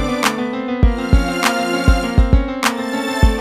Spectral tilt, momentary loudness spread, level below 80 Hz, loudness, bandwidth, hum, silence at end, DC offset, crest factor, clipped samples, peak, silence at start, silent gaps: -5.5 dB/octave; 5 LU; -18 dBFS; -17 LUFS; 15.5 kHz; none; 0 s; under 0.1%; 16 dB; under 0.1%; 0 dBFS; 0 s; none